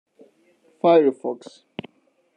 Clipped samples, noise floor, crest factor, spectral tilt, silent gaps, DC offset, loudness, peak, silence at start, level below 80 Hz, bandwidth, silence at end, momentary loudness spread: under 0.1%; -64 dBFS; 20 dB; -7 dB/octave; none; under 0.1%; -20 LUFS; -4 dBFS; 0.85 s; -78 dBFS; 9.2 kHz; 1 s; 22 LU